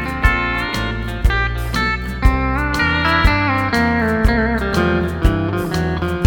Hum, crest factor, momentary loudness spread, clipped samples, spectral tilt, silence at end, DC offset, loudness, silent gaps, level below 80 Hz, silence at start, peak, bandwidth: none; 16 dB; 5 LU; under 0.1%; -6 dB/octave; 0 s; under 0.1%; -17 LUFS; none; -22 dBFS; 0 s; 0 dBFS; 19 kHz